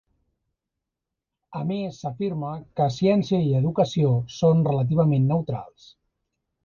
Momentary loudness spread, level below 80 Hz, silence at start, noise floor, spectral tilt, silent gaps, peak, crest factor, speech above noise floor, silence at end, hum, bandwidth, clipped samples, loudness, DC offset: 11 LU; -56 dBFS; 1.5 s; -85 dBFS; -8.5 dB/octave; none; -8 dBFS; 16 dB; 63 dB; 1 s; none; 7 kHz; under 0.1%; -23 LUFS; under 0.1%